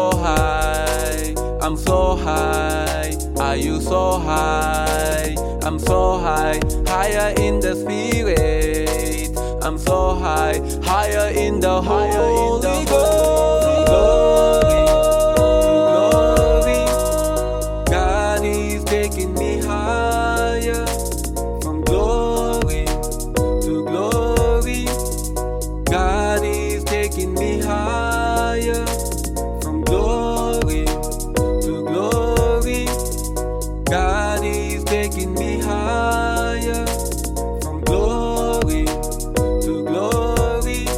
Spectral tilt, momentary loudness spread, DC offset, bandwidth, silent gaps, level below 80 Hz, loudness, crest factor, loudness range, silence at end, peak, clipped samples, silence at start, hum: -5 dB/octave; 8 LU; under 0.1%; 16.5 kHz; none; -24 dBFS; -19 LUFS; 16 dB; 6 LU; 0 s; -2 dBFS; under 0.1%; 0 s; none